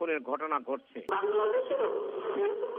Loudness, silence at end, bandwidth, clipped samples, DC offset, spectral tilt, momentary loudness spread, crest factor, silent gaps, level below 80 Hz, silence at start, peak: -32 LUFS; 0 s; 3.7 kHz; under 0.1%; under 0.1%; -1.5 dB/octave; 6 LU; 14 dB; none; -84 dBFS; 0 s; -16 dBFS